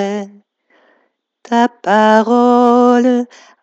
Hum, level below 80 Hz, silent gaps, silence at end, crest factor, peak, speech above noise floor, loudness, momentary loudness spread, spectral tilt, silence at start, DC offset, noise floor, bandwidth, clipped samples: none; -76 dBFS; none; 0.4 s; 14 dB; 0 dBFS; 51 dB; -12 LUFS; 14 LU; -5.5 dB/octave; 0 s; under 0.1%; -62 dBFS; 7.8 kHz; under 0.1%